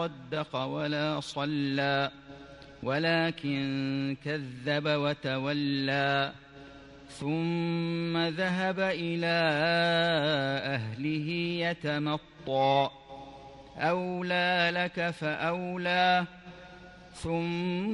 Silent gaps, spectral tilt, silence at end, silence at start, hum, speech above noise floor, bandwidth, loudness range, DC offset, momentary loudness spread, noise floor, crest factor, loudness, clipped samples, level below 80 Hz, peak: none; -6 dB/octave; 0 s; 0 s; none; 20 dB; 11 kHz; 3 LU; under 0.1%; 21 LU; -50 dBFS; 18 dB; -29 LUFS; under 0.1%; -62 dBFS; -14 dBFS